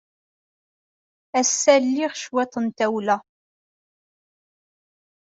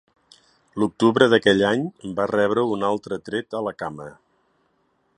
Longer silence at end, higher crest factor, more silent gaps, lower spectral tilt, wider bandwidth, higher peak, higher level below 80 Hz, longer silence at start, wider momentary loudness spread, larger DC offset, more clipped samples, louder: first, 2.1 s vs 1.05 s; about the same, 22 dB vs 22 dB; neither; second, -2.5 dB/octave vs -5.5 dB/octave; second, 8.2 kHz vs 11 kHz; about the same, -4 dBFS vs -2 dBFS; second, -74 dBFS vs -60 dBFS; first, 1.35 s vs 0.75 s; second, 9 LU vs 16 LU; neither; neither; about the same, -21 LUFS vs -21 LUFS